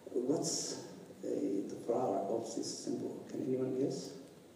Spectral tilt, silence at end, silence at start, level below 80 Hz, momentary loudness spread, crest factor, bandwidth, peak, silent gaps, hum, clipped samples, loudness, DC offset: -4.5 dB/octave; 0 s; 0 s; -82 dBFS; 11 LU; 16 dB; 15.5 kHz; -22 dBFS; none; none; under 0.1%; -38 LUFS; under 0.1%